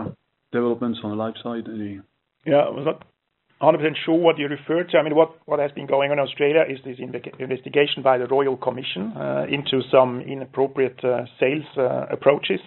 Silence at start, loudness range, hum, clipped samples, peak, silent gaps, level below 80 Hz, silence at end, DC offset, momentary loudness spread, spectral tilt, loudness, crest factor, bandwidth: 0 s; 3 LU; none; under 0.1%; -2 dBFS; none; -68 dBFS; 0.05 s; under 0.1%; 12 LU; -4 dB/octave; -22 LUFS; 20 dB; 4.2 kHz